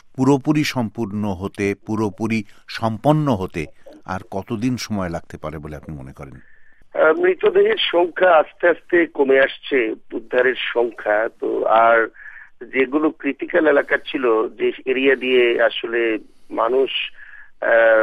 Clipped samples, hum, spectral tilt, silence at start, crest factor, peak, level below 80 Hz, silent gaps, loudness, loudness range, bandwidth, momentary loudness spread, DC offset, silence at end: under 0.1%; none; -6 dB/octave; 0.15 s; 16 dB; -2 dBFS; -52 dBFS; none; -19 LUFS; 6 LU; 13.5 kHz; 15 LU; under 0.1%; 0 s